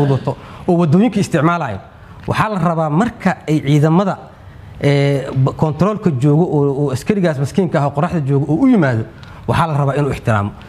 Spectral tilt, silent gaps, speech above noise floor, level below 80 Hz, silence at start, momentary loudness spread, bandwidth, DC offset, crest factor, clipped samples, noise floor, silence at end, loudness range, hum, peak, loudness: -8 dB/octave; none; 21 dB; -42 dBFS; 0 s; 8 LU; 12.5 kHz; under 0.1%; 16 dB; under 0.1%; -36 dBFS; 0 s; 1 LU; none; 0 dBFS; -16 LUFS